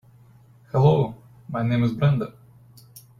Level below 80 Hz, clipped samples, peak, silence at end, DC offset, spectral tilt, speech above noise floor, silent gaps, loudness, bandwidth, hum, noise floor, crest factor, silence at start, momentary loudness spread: -54 dBFS; under 0.1%; -6 dBFS; 0.2 s; under 0.1%; -9 dB/octave; 32 dB; none; -22 LUFS; 12.5 kHz; none; -52 dBFS; 18 dB; 0.75 s; 14 LU